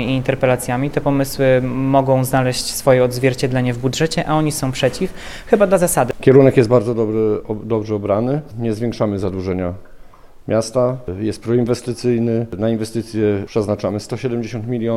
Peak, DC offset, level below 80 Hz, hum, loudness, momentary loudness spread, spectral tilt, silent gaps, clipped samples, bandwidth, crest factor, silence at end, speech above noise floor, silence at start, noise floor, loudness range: 0 dBFS; under 0.1%; -40 dBFS; none; -17 LUFS; 9 LU; -6 dB/octave; none; under 0.1%; 15.5 kHz; 16 dB; 0 s; 22 dB; 0 s; -39 dBFS; 6 LU